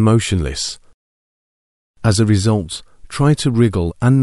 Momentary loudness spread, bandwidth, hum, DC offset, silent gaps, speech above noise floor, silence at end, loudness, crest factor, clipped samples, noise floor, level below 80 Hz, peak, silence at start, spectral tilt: 14 LU; 11.5 kHz; none; under 0.1%; 0.94-1.94 s; over 75 dB; 0 s; -16 LUFS; 16 dB; under 0.1%; under -90 dBFS; -36 dBFS; -2 dBFS; 0 s; -6 dB/octave